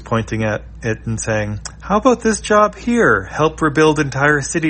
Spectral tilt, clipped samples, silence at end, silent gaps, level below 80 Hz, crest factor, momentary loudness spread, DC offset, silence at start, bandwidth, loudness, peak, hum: -5 dB/octave; under 0.1%; 0 s; none; -36 dBFS; 16 dB; 9 LU; under 0.1%; 0 s; 8.8 kHz; -16 LUFS; 0 dBFS; none